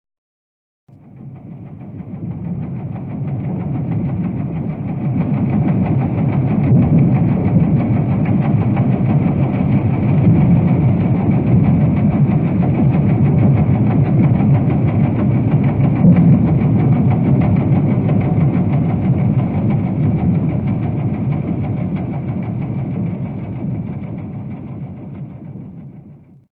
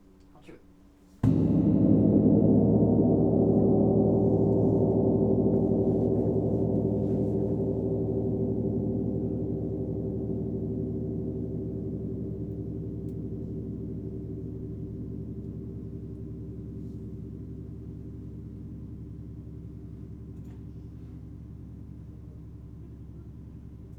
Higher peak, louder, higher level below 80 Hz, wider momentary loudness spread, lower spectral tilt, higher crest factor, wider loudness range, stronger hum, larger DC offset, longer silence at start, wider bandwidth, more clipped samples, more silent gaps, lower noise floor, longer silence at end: first, 0 dBFS vs -8 dBFS; first, -15 LUFS vs -27 LUFS; first, -36 dBFS vs -44 dBFS; second, 15 LU vs 21 LU; about the same, -13 dB/octave vs -12.5 dB/octave; second, 14 dB vs 20 dB; second, 11 LU vs 20 LU; neither; neither; first, 1.15 s vs 0.35 s; first, 3.6 kHz vs 2.9 kHz; neither; neither; second, -41 dBFS vs -55 dBFS; first, 0.4 s vs 0 s